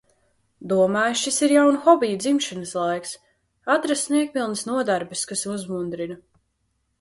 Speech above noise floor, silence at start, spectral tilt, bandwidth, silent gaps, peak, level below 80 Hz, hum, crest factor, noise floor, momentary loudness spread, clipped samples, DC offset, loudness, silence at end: 50 dB; 0.6 s; -3.5 dB/octave; 11.5 kHz; none; -2 dBFS; -66 dBFS; none; 20 dB; -72 dBFS; 16 LU; under 0.1%; under 0.1%; -22 LUFS; 0.85 s